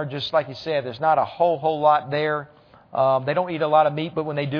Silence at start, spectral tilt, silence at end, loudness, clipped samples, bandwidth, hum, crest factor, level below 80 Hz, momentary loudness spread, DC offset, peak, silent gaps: 0 s; -7.5 dB/octave; 0 s; -22 LUFS; under 0.1%; 5.4 kHz; none; 18 dB; -64 dBFS; 8 LU; under 0.1%; -4 dBFS; none